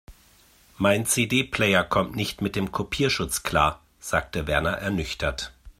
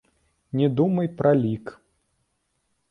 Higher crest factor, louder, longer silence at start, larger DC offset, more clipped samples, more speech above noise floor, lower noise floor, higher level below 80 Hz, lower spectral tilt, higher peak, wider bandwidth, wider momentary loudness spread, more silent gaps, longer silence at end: about the same, 22 dB vs 18 dB; about the same, -24 LUFS vs -23 LUFS; second, 0.1 s vs 0.55 s; neither; neither; second, 32 dB vs 51 dB; second, -57 dBFS vs -73 dBFS; first, -44 dBFS vs -60 dBFS; second, -4 dB/octave vs -10 dB/octave; first, -4 dBFS vs -8 dBFS; first, 16 kHz vs 5.8 kHz; second, 7 LU vs 12 LU; neither; second, 0.1 s vs 1.2 s